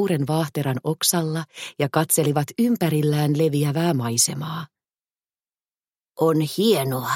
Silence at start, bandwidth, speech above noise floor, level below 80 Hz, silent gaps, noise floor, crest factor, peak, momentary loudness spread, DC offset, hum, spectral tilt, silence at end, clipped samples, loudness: 0 s; 17 kHz; over 69 dB; -64 dBFS; none; under -90 dBFS; 16 dB; -6 dBFS; 9 LU; under 0.1%; none; -5 dB/octave; 0 s; under 0.1%; -21 LUFS